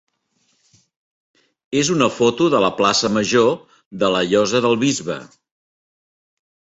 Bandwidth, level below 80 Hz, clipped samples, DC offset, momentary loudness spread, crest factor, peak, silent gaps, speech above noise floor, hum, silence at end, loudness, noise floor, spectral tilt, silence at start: 8.2 kHz; -58 dBFS; under 0.1%; under 0.1%; 10 LU; 18 dB; -2 dBFS; 3.86-3.91 s; 49 dB; none; 1.5 s; -17 LUFS; -66 dBFS; -4 dB/octave; 1.7 s